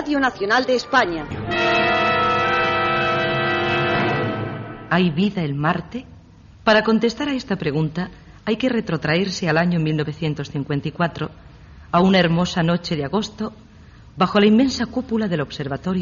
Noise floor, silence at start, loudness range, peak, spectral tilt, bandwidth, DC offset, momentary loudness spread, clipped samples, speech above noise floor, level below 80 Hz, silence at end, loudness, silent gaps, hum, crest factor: -45 dBFS; 0 s; 3 LU; -4 dBFS; -4 dB/octave; 7.2 kHz; under 0.1%; 11 LU; under 0.1%; 26 dB; -46 dBFS; 0 s; -20 LUFS; none; none; 16 dB